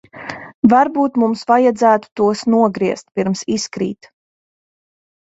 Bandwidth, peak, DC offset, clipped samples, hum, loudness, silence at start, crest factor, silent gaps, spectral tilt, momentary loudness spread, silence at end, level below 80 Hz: 8 kHz; 0 dBFS; under 0.1%; under 0.1%; none; -16 LUFS; 0.15 s; 16 dB; 0.54-0.63 s, 2.12-2.16 s; -5.5 dB/octave; 13 LU; 1.4 s; -58 dBFS